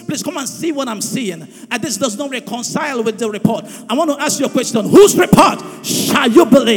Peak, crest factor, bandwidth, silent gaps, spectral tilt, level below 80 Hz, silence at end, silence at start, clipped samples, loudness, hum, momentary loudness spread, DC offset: 0 dBFS; 14 dB; 19.5 kHz; none; -4 dB/octave; -46 dBFS; 0 s; 0 s; 1%; -14 LUFS; none; 14 LU; under 0.1%